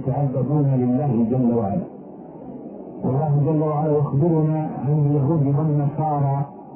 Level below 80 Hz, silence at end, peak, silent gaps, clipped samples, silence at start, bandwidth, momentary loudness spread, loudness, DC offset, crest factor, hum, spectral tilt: -54 dBFS; 0 s; -8 dBFS; none; under 0.1%; 0 s; 2.8 kHz; 17 LU; -21 LUFS; under 0.1%; 12 dB; none; -15 dB/octave